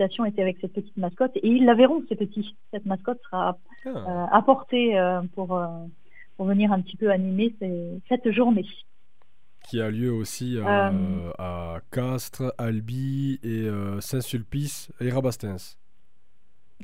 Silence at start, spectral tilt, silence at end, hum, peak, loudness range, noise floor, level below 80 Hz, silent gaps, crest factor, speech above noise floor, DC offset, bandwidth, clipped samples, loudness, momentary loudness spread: 0 s; -6.5 dB/octave; 0 s; none; -2 dBFS; 6 LU; -70 dBFS; -56 dBFS; none; 24 dB; 45 dB; 0.9%; 16 kHz; under 0.1%; -25 LUFS; 13 LU